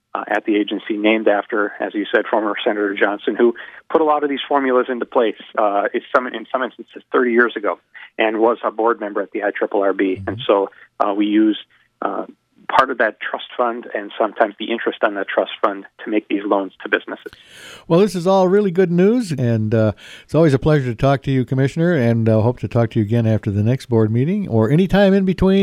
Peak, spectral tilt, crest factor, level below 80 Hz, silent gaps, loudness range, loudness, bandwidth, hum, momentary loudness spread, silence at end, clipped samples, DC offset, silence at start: 0 dBFS; -7.5 dB/octave; 18 dB; -46 dBFS; none; 4 LU; -18 LUFS; 13 kHz; none; 9 LU; 0 s; under 0.1%; under 0.1%; 0.15 s